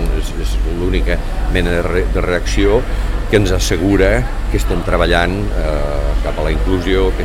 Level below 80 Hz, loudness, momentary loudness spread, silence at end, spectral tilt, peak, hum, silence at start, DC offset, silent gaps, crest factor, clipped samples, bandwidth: -16 dBFS; -16 LUFS; 7 LU; 0 s; -5.5 dB/octave; 0 dBFS; none; 0 s; 0.3%; none; 14 dB; under 0.1%; 14 kHz